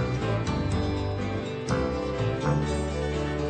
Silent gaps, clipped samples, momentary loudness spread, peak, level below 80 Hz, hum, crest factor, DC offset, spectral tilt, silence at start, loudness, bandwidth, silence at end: none; under 0.1%; 3 LU; -14 dBFS; -36 dBFS; none; 14 dB; under 0.1%; -6.5 dB/octave; 0 s; -28 LUFS; 9 kHz; 0 s